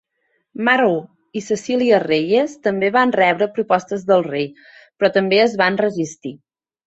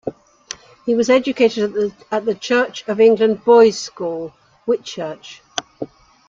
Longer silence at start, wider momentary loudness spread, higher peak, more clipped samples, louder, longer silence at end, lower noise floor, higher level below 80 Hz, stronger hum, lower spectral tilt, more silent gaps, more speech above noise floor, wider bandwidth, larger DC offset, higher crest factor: first, 0.6 s vs 0.05 s; second, 12 LU vs 21 LU; about the same, -2 dBFS vs -2 dBFS; neither; about the same, -17 LUFS vs -17 LUFS; about the same, 0.5 s vs 0.45 s; first, -68 dBFS vs -38 dBFS; about the same, -64 dBFS vs -60 dBFS; neither; about the same, -5 dB/octave vs -4 dB/octave; neither; first, 51 dB vs 21 dB; about the same, 8.2 kHz vs 7.6 kHz; neither; about the same, 18 dB vs 16 dB